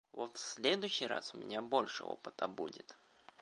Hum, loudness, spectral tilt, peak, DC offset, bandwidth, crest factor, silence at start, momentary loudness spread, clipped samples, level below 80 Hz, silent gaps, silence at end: none; -39 LUFS; -2.5 dB/octave; -16 dBFS; under 0.1%; 11 kHz; 24 dB; 0.15 s; 11 LU; under 0.1%; -86 dBFS; none; 0.45 s